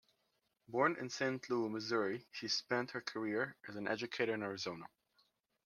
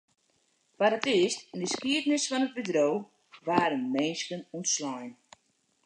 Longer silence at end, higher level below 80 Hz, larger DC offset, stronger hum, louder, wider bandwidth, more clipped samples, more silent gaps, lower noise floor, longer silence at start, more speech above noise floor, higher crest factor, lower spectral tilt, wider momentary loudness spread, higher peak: about the same, 0.8 s vs 0.75 s; second, -84 dBFS vs -78 dBFS; neither; neither; second, -39 LUFS vs -29 LUFS; first, 13.5 kHz vs 10 kHz; neither; neither; first, -82 dBFS vs -72 dBFS; about the same, 0.7 s vs 0.8 s; about the same, 43 dB vs 44 dB; about the same, 22 dB vs 24 dB; about the same, -4 dB/octave vs -3 dB/octave; about the same, 8 LU vs 10 LU; second, -18 dBFS vs -8 dBFS